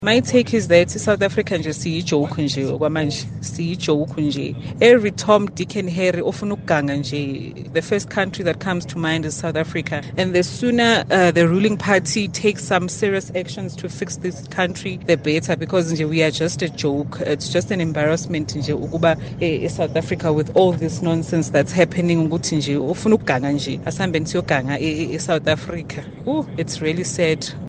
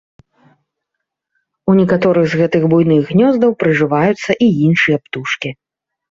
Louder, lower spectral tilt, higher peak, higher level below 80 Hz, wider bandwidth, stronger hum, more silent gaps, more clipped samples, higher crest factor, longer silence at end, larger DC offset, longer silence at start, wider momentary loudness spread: second, -20 LUFS vs -13 LUFS; second, -5 dB/octave vs -7.5 dB/octave; about the same, 0 dBFS vs -2 dBFS; about the same, -50 dBFS vs -52 dBFS; first, 9.8 kHz vs 7.6 kHz; neither; neither; neither; first, 20 dB vs 14 dB; second, 0 s vs 0.6 s; neither; second, 0 s vs 1.65 s; about the same, 9 LU vs 9 LU